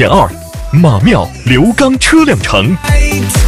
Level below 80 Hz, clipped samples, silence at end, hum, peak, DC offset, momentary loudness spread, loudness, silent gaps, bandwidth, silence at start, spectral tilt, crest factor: -18 dBFS; 0.5%; 0 s; none; 0 dBFS; 0.9%; 5 LU; -9 LUFS; none; 16 kHz; 0 s; -5.5 dB/octave; 8 dB